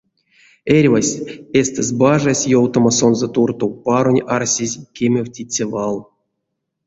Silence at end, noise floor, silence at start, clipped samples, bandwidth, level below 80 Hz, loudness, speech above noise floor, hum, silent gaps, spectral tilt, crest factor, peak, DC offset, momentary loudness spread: 0.85 s; -75 dBFS; 0.65 s; under 0.1%; 8 kHz; -52 dBFS; -16 LUFS; 59 dB; none; none; -5 dB/octave; 16 dB; 0 dBFS; under 0.1%; 9 LU